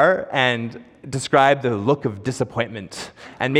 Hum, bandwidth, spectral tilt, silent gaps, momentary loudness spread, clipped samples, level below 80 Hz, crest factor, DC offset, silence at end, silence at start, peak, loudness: none; 13.5 kHz; -5 dB/octave; none; 17 LU; under 0.1%; -60 dBFS; 18 dB; under 0.1%; 0 s; 0 s; -2 dBFS; -20 LUFS